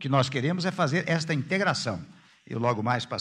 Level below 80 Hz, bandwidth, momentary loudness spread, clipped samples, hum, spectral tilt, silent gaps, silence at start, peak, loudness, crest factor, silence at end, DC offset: -66 dBFS; 11 kHz; 6 LU; under 0.1%; none; -5.5 dB/octave; none; 0 s; -8 dBFS; -27 LUFS; 20 dB; 0 s; under 0.1%